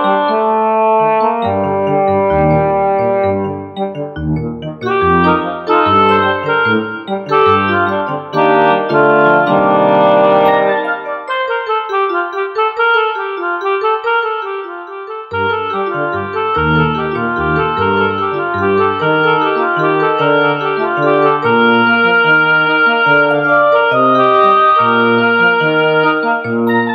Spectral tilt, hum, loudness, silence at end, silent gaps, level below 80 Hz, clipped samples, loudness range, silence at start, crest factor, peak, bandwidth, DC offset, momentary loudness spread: -8 dB/octave; none; -12 LUFS; 0 s; none; -42 dBFS; under 0.1%; 6 LU; 0 s; 12 dB; 0 dBFS; 6.2 kHz; under 0.1%; 9 LU